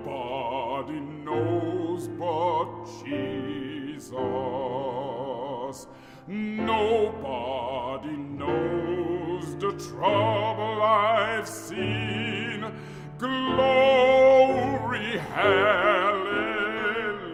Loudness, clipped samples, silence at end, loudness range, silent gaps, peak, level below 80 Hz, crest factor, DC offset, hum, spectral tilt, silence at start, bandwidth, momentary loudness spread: -26 LUFS; under 0.1%; 0 s; 9 LU; none; -8 dBFS; -58 dBFS; 18 dB; under 0.1%; none; -5.5 dB/octave; 0 s; 15 kHz; 14 LU